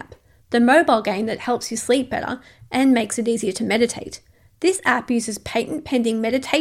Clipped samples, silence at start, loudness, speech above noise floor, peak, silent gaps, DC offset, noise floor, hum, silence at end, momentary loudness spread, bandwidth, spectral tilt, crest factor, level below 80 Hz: under 0.1%; 0 s; -20 LUFS; 28 dB; -2 dBFS; none; under 0.1%; -48 dBFS; none; 0 s; 11 LU; 15 kHz; -3.5 dB/octave; 18 dB; -56 dBFS